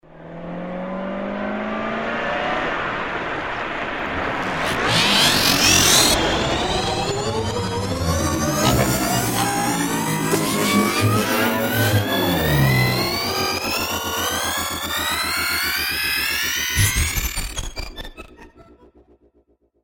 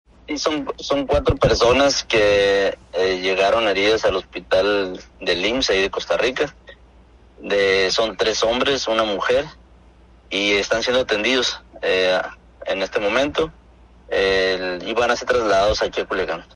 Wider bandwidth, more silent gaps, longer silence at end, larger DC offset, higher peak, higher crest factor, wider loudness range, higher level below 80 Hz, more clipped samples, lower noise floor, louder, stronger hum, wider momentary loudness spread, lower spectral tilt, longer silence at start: first, 17 kHz vs 11 kHz; neither; first, 1.2 s vs 0.1 s; neither; first, 0 dBFS vs -4 dBFS; about the same, 20 dB vs 16 dB; first, 8 LU vs 4 LU; about the same, -36 dBFS vs -40 dBFS; neither; first, -61 dBFS vs -49 dBFS; about the same, -19 LUFS vs -19 LUFS; neither; first, 13 LU vs 9 LU; about the same, -3 dB/octave vs -3.5 dB/octave; second, 0.1 s vs 0.3 s